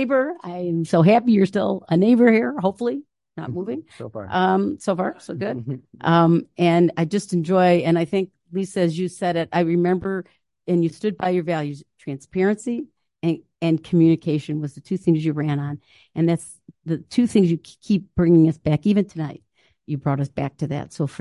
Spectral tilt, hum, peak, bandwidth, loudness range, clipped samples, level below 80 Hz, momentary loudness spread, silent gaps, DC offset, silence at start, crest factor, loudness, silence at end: -7.5 dB/octave; none; -4 dBFS; 11.5 kHz; 5 LU; under 0.1%; -54 dBFS; 15 LU; none; under 0.1%; 0 s; 16 dB; -21 LUFS; 0.05 s